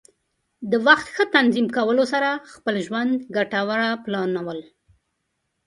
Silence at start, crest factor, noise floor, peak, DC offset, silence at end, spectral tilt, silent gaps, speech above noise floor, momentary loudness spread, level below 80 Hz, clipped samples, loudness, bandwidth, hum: 0.6 s; 22 dB; -75 dBFS; 0 dBFS; under 0.1%; 1.05 s; -5 dB/octave; none; 54 dB; 10 LU; -66 dBFS; under 0.1%; -21 LUFS; 11.5 kHz; none